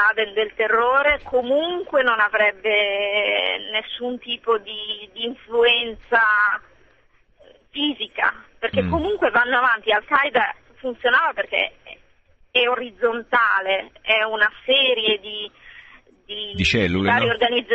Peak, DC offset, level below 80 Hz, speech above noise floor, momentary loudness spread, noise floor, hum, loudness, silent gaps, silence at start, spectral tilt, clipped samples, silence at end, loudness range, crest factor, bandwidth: -4 dBFS; under 0.1%; -46 dBFS; 37 dB; 11 LU; -57 dBFS; none; -20 LUFS; none; 0 s; -4.5 dB/octave; under 0.1%; 0 s; 3 LU; 18 dB; 8.4 kHz